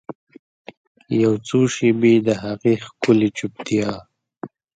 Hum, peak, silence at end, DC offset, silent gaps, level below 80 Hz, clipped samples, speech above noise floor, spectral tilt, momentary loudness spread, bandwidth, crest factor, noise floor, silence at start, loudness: none; -2 dBFS; 0.3 s; under 0.1%; 0.15-0.27 s, 0.39-0.65 s, 0.77-0.95 s; -58 dBFS; under 0.1%; 20 dB; -6 dB/octave; 21 LU; 9.2 kHz; 18 dB; -38 dBFS; 0.1 s; -19 LUFS